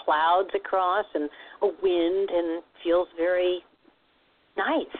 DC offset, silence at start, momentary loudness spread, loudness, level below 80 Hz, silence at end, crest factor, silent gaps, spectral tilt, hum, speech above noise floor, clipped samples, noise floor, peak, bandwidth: under 0.1%; 0 s; 9 LU; -26 LUFS; -62 dBFS; 0 s; 14 dB; none; -7.5 dB/octave; none; 39 dB; under 0.1%; -65 dBFS; -12 dBFS; 4.4 kHz